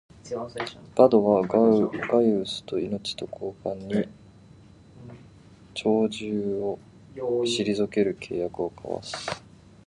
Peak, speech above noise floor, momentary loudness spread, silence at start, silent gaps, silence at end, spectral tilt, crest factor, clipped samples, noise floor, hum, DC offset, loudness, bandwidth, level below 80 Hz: -4 dBFS; 26 dB; 16 LU; 0.25 s; none; 0.45 s; -5.5 dB/octave; 22 dB; under 0.1%; -51 dBFS; none; under 0.1%; -26 LUFS; 11.5 kHz; -60 dBFS